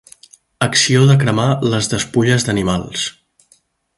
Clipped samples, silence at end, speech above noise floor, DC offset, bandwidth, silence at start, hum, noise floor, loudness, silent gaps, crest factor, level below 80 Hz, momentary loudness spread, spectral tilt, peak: under 0.1%; 0.85 s; 42 dB; under 0.1%; 11.5 kHz; 0.6 s; none; -56 dBFS; -15 LUFS; none; 16 dB; -44 dBFS; 10 LU; -4.5 dB/octave; 0 dBFS